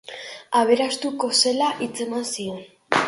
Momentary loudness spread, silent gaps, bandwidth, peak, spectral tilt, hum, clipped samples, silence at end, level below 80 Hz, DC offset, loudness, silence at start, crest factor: 15 LU; none; 11.5 kHz; -2 dBFS; -2 dB/octave; none; under 0.1%; 0 s; -68 dBFS; under 0.1%; -22 LUFS; 0.1 s; 20 dB